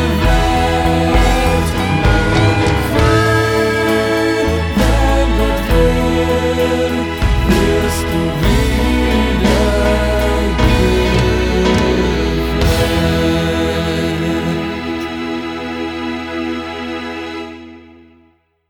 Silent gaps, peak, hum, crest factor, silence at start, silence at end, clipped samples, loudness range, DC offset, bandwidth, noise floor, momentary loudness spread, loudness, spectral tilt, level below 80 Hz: none; 0 dBFS; none; 14 dB; 0 s; 0.9 s; under 0.1%; 7 LU; under 0.1%; 19.5 kHz; -54 dBFS; 9 LU; -15 LUFS; -6 dB/octave; -20 dBFS